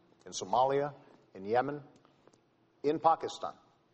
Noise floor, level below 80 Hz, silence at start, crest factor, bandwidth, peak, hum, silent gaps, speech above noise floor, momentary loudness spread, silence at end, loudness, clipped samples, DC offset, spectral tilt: -69 dBFS; -74 dBFS; 0.25 s; 22 dB; 8.2 kHz; -12 dBFS; none; none; 37 dB; 14 LU; 0.4 s; -33 LUFS; under 0.1%; under 0.1%; -4.5 dB/octave